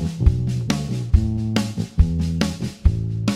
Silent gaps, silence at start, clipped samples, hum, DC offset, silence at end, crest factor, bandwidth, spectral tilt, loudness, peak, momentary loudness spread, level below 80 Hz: none; 0 s; under 0.1%; none; under 0.1%; 0 s; 18 dB; 13 kHz; -6.5 dB/octave; -22 LUFS; -2 dBFS; 3 LU; -24 dBFS